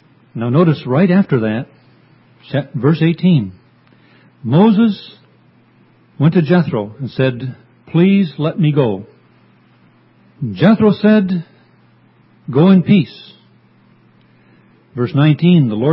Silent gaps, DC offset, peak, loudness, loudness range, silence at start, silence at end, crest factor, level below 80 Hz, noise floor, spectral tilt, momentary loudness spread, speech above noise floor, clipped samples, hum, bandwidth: none; under 0.1%; 0 dBFS; -14 LUFS; 3 LU; 0.35 s; 0 s; 16 dB; -54 dBFS; -50 dBFS; -11.5 dB/octave; 16 LU; 38 dB; under 0.1%; none; 5.8 kHz